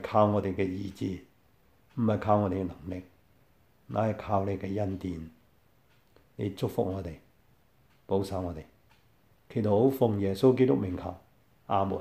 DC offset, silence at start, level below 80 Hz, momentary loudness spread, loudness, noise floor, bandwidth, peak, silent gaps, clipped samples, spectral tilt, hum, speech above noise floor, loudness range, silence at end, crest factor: under 0.1%; 0 s; -58 dBFS; 17 LU; -30 LUFS; -66 dBFS; 15.5 kHz; -10 dBFS; none; under 0.1%; -8.5 dB/octave; none; 37 dB; 8 LU; 0 s; 22 dB